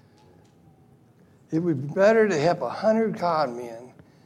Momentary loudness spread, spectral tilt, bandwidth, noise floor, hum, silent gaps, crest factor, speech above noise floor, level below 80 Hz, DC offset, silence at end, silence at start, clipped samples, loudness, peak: 15 LU; -6.5 dB/octave; 12 kHz; -56 dBFS; none; none; 16 dB; 34 dB; -72 dBFS; under 0.1%; 0.35 s; 1.5 s; under 0.1%; -23 LUFS; -8 dBFS